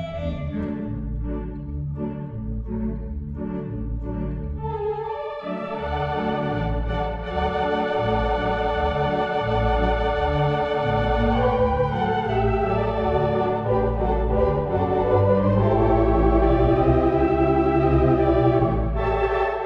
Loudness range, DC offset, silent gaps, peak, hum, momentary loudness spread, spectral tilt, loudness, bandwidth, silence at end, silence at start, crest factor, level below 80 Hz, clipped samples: 10 LU; under 0.1%; none; -6 dBFS; none; 11 LU; -9 dB/octave; -23 LUFS; 5.8 kHz; 0 s; 0 s; 14 dB; -30 dBFS; under 0.1%